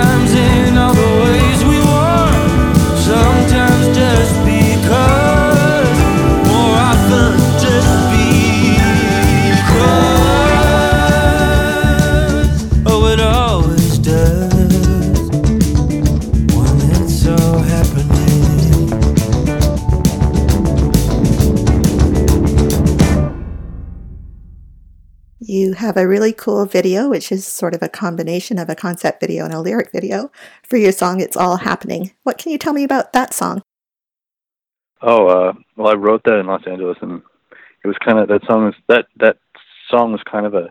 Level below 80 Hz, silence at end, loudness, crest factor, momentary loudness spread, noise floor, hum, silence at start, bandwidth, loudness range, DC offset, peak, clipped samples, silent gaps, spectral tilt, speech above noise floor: -20 dBFS; 0 s; -13 LUFS; 12 dB; 10 LU; under -90 dBFS; none; 0 s; 19 kHz; 8 LU; under 0.1%; 0 dBFS; under 0.1%; none; -6 dB/octave; over 74 dB